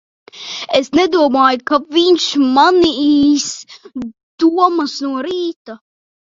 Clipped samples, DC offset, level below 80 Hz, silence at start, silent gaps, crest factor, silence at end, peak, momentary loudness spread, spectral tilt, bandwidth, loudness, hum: under 0.1%; under 0.1%; -52 dBFS; 0.35 s; 4.23-4.38 s, 5.56-5.65 s; 14 dB; 0.55 s; 0 dBFS; 17 LU; -3 dB/octave; 7.8 kHz; -13 LUFS; none